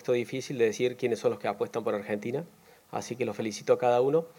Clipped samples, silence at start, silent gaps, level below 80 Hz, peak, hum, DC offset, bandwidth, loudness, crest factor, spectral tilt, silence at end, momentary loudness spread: under 0.1%; 0 s; none; -80 dBFS; -10 dBFS; none; under 0.1%; 17 kHz; -30 LUFS; 18 dB; -5.5 dB/octave; 0.1 s; 12 LU